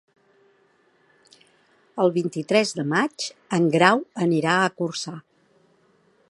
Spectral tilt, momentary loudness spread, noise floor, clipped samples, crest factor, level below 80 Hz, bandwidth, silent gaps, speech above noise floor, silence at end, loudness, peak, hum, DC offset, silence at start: -5 dB/octave; 14 LU; -62 dBFS; under 0.1%; 24 dB; -74 dBFS; 11.5 kHz; none; 40 dB; 1.1 s; -22 LUFS; 0 dBFS; none; under 0.1%; 1.95 s